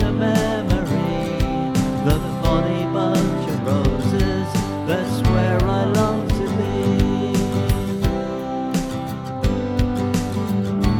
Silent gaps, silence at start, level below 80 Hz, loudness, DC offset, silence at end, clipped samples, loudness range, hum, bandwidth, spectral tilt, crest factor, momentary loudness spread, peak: none; 0 s; -30 dBFS; -21 LUFS; under 0.1%; 0 s; under 0.1%; 2 LU; none; 19 kHz; -7 dB/octave; 16 dB; 5 LU; -4 dBFS